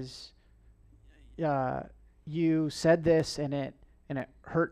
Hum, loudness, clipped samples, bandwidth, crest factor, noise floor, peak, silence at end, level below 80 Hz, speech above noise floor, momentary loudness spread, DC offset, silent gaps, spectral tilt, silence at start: none; -30 LUFS; under 0.1%; 12.5 kHz; 18 dB; -60 dBFS; -12 dBFS; 0 s; -56 dBFS; 30 dB; 20 LU; under 0.1%; none; -6.5 dB/octave; 0 s